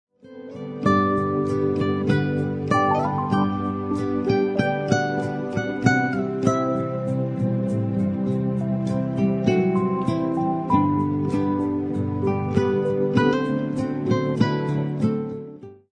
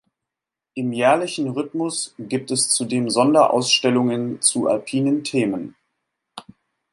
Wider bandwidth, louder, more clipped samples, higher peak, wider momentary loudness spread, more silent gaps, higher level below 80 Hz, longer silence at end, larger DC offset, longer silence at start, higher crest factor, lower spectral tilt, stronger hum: second, 10 kHz vs 11.5 kHz; second, -23 LUFS vs -20 LUFS; neither; about the same, -2 dBFS vs -2 dBFS; second, 6 LU vs 13 LU; neither; first, -54 dBFS vs -68 dBFS; second, 0.2 s vs 0.5 s; neither; second, 0.25 s vs 0.75 s; about the same, 20 dB vs 18 dB; first, -7.5 dB/octave vs -3.5 dB/octave; neither